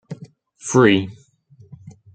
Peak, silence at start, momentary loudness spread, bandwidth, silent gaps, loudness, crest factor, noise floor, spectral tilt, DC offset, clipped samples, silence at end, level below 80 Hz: -2 dBFS; 0.1 s; 23 LU; 9.2 kHz; none; -16 LUFS; 20 dB; -51 dBFS; -5 dB/octave; under 0.1%; under 0.1%; 0.25 s; -60 dBFS